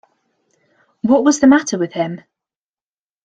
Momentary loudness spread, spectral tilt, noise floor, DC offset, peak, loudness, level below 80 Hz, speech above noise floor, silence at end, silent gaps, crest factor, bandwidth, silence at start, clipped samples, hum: 13 LU; -4.5 dB/octave; under -90 dBFS; under 0.1%; -2 dBFS; -15 LUFS; -58 dBFS; over 76 dB; 1.05 s; none; 16 dB; 9.2 kHz; 1.05 s; under 0.1%; none